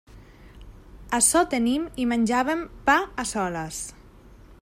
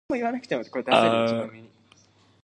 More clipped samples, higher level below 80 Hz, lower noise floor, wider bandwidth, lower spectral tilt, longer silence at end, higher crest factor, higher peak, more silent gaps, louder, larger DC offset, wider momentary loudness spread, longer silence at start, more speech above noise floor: neither; first, -48 dBFS vs -66 dBFS; second, -49 dBFS vs -58 dBFS; first, 16 kHz vs 10.5 kHz; second, -3 dB/octave vs -5.5 dB/octave; second, 0.1 s vs 0.8 s; about the same, 20 dB vs 22 dB; about the same, -6 dBFS vs -4 dBFS; neither; about the same, -23 LUFS vs -24 LUFS; neither; about the same, 12 LU vs 11 LU; about the same, 0.1 s vs 0.1 s; second, 25 dB vs 34 dB